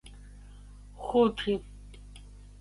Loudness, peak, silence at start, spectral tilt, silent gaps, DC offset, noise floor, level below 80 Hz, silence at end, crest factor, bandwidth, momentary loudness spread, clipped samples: -29 LUFS; -12 dBFS; 0.05 s; -6.5 dB/octave; none; under 0.1%; -48 dBFS; -48 dBFS; 0.15 s; 20 dB; 11.5 kHz; 26 LU; under 0.1%